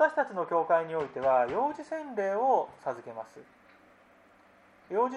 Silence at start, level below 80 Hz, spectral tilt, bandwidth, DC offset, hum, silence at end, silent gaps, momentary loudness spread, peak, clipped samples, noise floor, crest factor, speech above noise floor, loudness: 0 s; -72 dBFS; -6 dB/octave; 10.5 kHz; under 0.1%; none; 0 s; none; 13 LU; -12 dBFS; under 0.1%; -60 dBFS; 18 dB; 30 dB; -30 LUFS